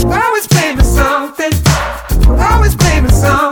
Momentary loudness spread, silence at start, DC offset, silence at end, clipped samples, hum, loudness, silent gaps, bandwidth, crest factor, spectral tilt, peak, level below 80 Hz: 5 LU; 0 s; under 0.1%; 0 s; 0.1%; none; -11 LUFS; none; 20 kHz; 10 dB; -5 dB/octave; 0 dBFS; -14 dBFS